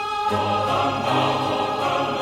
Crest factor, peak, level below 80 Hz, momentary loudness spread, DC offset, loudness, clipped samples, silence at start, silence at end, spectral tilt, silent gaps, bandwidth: 14 dB; -8 dBFS; -54 dBFS; 2 LU; under 0.1%; -22 LUFS; under 0.1%; 0 s; 0 s; -5 dB/octave; none; 16 kHz